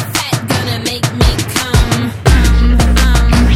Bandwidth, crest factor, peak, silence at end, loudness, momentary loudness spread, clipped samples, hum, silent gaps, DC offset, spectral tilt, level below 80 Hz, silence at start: 15.5 kHz; 10 dB; 0 dBFS; 0 s; -13 LUFS; 5 LU; under 0.1%; none; none; under 0.1%; -4.5 dB/octave; -14 dBFS; 0 s